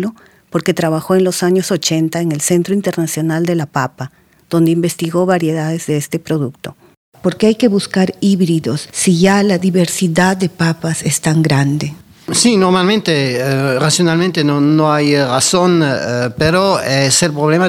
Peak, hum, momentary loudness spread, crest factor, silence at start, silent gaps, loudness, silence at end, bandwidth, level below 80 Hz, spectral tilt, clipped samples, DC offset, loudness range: 0 dBFS; none; 8 LU; 14 dB; 0 s; 6.97-7.12 s; -14 LUFS; 0 s; 16 kHz; -50 dBFS; -5 dB/octave; under 0.1%; under 0.1%; 4 LU